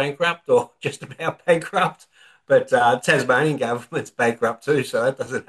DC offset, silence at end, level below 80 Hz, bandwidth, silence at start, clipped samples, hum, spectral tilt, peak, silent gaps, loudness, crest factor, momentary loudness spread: under 0.1%; 0.05 s; -66 dBFS; 12.5 kHz; 0 s; under 0.1%; none; -5 dB/octave; -2 dBFS; none; -21 LUFS; 18 dB; 11 LU